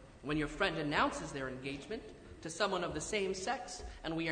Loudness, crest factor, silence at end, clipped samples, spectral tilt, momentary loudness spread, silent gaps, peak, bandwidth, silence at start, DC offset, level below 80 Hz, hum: -37 LUFS; 20 dB; 0 s; under 0.1%; -4 dB/octave; 13 LU; none; -18 dBFS; 9.6 kHz; 0 s; under 0.1%; -56 dBFS; none